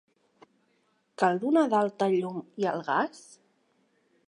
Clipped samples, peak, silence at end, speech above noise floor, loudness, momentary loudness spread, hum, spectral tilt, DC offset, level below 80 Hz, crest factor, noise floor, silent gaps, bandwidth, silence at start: under 0.1%; -10 dBFS; 1.1 s; 44 dB; -27 LUFS; 8 LU; none; -6.5 dB/octave; under 0.1%; -84 dBFS; 20 dB; -71 dBFS; none; 11 kHz; 1.2 s